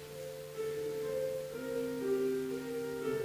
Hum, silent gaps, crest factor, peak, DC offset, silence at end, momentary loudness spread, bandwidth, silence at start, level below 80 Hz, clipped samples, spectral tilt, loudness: none; none; 14 dB; -22 dBFS; under 0.1%; 0 s; 8 LU; 16 kHz; 0 s; -68 dBFS; under 0.1%; -5.5 dB/octave; -38 LUFS